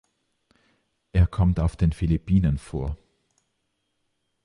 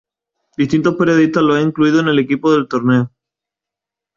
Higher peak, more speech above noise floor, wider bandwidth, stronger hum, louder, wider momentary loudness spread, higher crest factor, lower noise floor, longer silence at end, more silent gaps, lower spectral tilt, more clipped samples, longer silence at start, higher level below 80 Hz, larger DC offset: second, -8 dBFS vs -2 dBFS; second, 53 dB vs 72 dB; first, 11 kHz vs 7.4 kHz; neither; second, -24 LUFS vs -14 LUFS; first, 10 LU vs 5 LU; about the same, 16 dB vs 14 dB; second, -75 dBFS vs -85 dBFS; first, 1.5 s vs 1.1 s; neither; first, -9 dB/octave vs -7 dB/octave; neither; first, 1.15 s vs 0.6 s; first, -32 dBFS vs -54 dBFS; neither